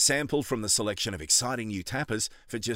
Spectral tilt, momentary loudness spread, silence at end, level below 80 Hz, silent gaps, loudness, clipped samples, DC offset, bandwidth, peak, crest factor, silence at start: -2.5 dB/octave; 9 LU; 0 s; -56 dBFS; none; -27 LUFS; under 0.1%; under 0.1%; 16 kHz; -10 dBFS; 18 dB; 0 s